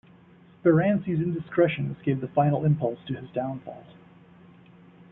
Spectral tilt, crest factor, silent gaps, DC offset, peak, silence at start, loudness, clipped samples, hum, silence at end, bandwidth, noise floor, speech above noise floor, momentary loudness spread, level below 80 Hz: -12 dB/octave; 20 dB; none; under 0.1%; -8 dBFS; 0.65 s; -26 LUFS; under 0.1%; none; 1.2 s; 3.9 kHz; -54 dBFS; 29 dB; 13 LU; -60 dBFS